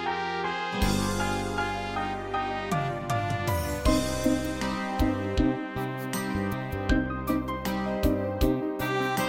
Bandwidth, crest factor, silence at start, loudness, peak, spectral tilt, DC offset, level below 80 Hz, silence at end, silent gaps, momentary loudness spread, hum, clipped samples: 17 kHz; 18 dB; 0 s; -29 LUFS; -10 dBFS; -5.5 dB/octave; under 0.1%; -38 dBFS; 0 s; none; 4 LU; none; under 0.1%